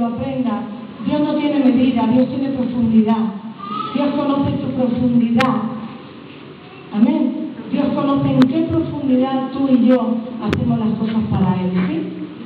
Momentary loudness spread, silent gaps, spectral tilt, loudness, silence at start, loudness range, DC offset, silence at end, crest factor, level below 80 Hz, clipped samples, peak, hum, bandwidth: 12 LU; none; -8.5 dB/octave; -18 LUFS; 0 s; 2 LU; under 0.1%; 0 s; 18 dB; -52 dBFS; under 0.1%; 0 dBFS; none; 6 kHz